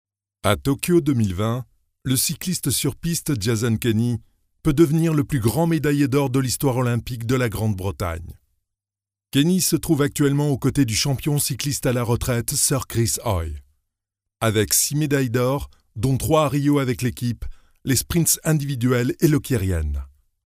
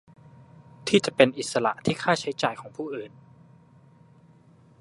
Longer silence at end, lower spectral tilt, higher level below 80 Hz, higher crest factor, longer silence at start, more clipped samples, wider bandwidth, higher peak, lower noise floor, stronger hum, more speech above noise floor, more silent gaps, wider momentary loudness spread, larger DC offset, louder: second, 0.4 s vs 1.75 s; about the same, -5 dB/octave vs -4.5 dB/octave; first, -40 dBFS vs -66 dBFS; second, 20 dB vs 28 dB; second, 0.45 s vs 0.85 s; neither; first, 16 kHz vs 11.5 kHz; about the same, 0 dBFS vs 0 dBFS; first, under -90 dBFS vs -55 dBFS; neither; first, over 70 dB vs 31 dB; neither; second, 8 LU vs 15 LU; neither; first, -21 LUFS vs -25 LUFS